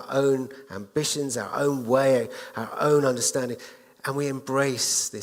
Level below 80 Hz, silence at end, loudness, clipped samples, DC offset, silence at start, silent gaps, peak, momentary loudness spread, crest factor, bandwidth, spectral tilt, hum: -68 dBFS; 0 s; -25 LUFS; under 0.1%; under 0.1%; 0 s; none; -8 dBFS; 13 LU; 18 dB; 16.5 kHz; -3.5 dB/octave; none